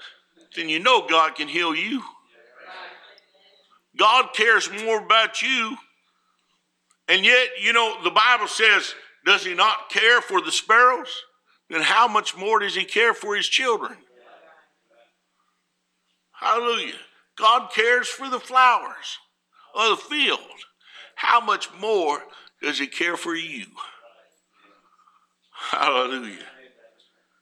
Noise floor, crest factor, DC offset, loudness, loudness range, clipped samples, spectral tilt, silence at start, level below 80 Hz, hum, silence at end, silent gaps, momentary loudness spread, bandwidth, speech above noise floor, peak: -74 dBFS; 20 dB; under 0.1%; -20 LUFS; 10 LU; under 0.1%; -1 dB/octave; 0 s; -84 dBFS; none; 0.95 s; none; 18 LU; 14.5 kHz; 53 dB; -2 dBFS